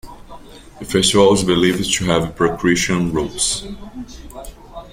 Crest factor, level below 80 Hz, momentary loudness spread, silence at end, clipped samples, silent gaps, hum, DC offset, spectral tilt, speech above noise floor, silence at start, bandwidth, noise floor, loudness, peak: 16 dB; -38 dBFS; 22 LU; 0.05 s; under 0.1%; none; none; under 0.1%; -4 dB/octave; 21 dB; 0.05 s; 16.5 kHz; -38 dBFS; -16 LUFS; -2 dBFS